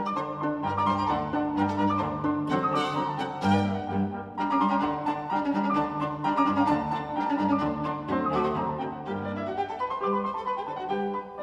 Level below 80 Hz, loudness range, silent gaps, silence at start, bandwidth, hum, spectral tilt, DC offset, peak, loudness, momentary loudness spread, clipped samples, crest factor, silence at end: -58 dBFS; 3 LU; none; 0 s; 10 kHz; none; -7.5 dB/octave; under 0.1%; -10 dBFS; -28 LUFS; 7 LU; under 0.1%; 16 dB; 0 s